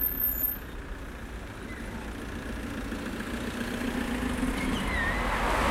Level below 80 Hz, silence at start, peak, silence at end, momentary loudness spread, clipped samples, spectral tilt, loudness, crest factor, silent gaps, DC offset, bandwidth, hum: -38 dBFS; 0 s; -14 dBFS; 0 s; 14 LU; under 0.1%; -5 dB/octave; -32 LUFS; 18 dB; none; under 0.1%; 16 kHz; none